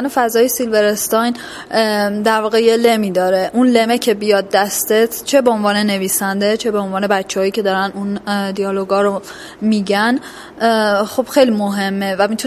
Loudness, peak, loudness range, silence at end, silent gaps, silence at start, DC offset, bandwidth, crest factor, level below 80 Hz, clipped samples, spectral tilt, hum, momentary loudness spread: -15 LUFS; 0 dBFS; 4 LU; 0 s; none; 0 s; under 0.1%; 16 kHz; 14 dB; -56 dBFS; under 0.1%; -4 dB/octave; none; 6 LU